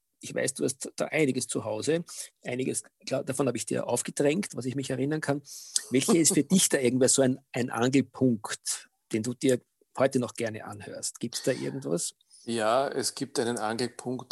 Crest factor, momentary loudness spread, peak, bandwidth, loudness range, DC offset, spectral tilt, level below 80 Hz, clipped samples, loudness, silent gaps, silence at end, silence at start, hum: 22 dB; 12 LU; -6 dBFS; 14 kHz; 6 LU; under 0.1%; -4 dB/octave; -74 dBFS; under 0.1%; -28 LUFS; none; 0.1 s; 0.25 s; none